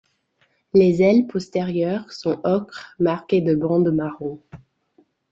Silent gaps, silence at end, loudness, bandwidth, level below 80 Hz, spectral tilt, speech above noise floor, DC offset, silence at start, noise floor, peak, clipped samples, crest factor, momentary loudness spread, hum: none; 0.75 s; -20 LUFS; 7.8 kHz; -58 dBFS; -8 dB/octave; 46 dB; under 0.1%; 0.75 s; -65 dBFS; -4 dBFS; under 0.1%; 16 dB; 12 LU; none